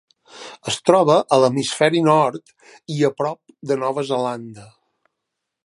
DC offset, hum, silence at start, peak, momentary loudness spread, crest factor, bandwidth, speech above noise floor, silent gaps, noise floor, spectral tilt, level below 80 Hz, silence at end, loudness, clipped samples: under 0.1%; none; 0.35 s; 0 dBFS; 19 LU; 20 dB; 11.5 kHz; 61 dB; none; -80 dBFS; -5 dB/octave; -66 dBFS; 1 s; -19 LUFS; under 0.1%